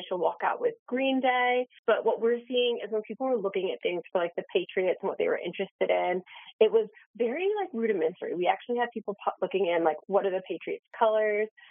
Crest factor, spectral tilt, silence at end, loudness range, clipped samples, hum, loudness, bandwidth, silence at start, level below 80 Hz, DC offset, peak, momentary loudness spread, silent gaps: 20 dB; -2.5 dB/octave; 0.25 s; 2 LU; under 0.1%; none; -29 LUFS; 3.7 kHz; 0 s; under -90 dBFS; under 0.1%; -10 dBFS; 7 LU; 0.79-0.86 s, 1.79-1.83 s, 5.71-5.79 s, 6.53-6.59 s, 7.06-7.14 s